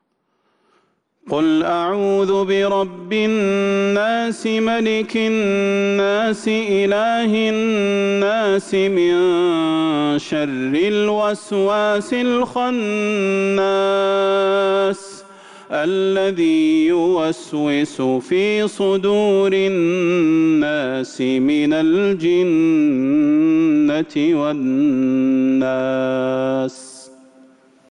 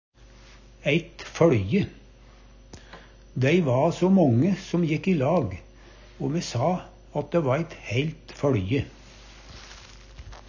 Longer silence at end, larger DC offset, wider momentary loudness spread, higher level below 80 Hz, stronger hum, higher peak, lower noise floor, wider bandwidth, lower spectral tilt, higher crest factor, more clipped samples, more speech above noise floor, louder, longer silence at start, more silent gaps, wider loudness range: first, 0.85 s vs 0.1 s; neither; second, 5 LU vs 23 LU; second, -60 dBFS vs -48 dBFS; neither; about the same, -8 dBFS vs -6 dBFS; first, -67 dBFS vs -50 dBFS; first, 11 kHz vs 7.6 kHz; second, -5.5 dB/octave vs -7 dB/octave; second, 8 dB vs 20 dB; neither; first, 50 dB vs 27 dB; first, -17 LUFS vs -25 LUFS; first, 1.25 s vs 0.85 s; neither; second, 2 LU vs 5 LU